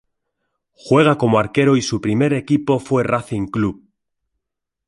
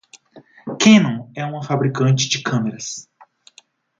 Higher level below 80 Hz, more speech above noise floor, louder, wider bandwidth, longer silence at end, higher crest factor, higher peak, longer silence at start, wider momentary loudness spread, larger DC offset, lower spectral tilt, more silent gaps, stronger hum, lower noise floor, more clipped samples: first, -50 dBFS vs -62 dBFS; first, 63 dB vs 36 dB; about the same, -17 LUFS vs -17 LUFS; first, 11.5 kHz vs 7.6 kHz; first, 1.15 s vs 0.95 s; about the same, 18 dB vs 20 dB; about the same, -2 dBFS vs 0 dBFS; first, 0.85 s vs 0.35 s; second, 7 LU vs 19 LU; neither; first, -6.5 dB/octave vs -5 dB/octave; neither; neither; first, -80 dBFS vs -53 dBFS; neither